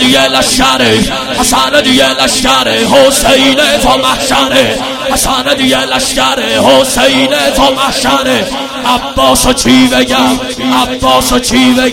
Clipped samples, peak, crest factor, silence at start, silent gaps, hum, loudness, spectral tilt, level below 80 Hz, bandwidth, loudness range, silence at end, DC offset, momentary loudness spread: 1%; 0 dBFS; 8 dB; 0 s; none; none; -8 LUFS; -2.5 dB/octave; -28 dBFS; 17 kHz; 2 LU; 0 s; under 0.1%; 5 LU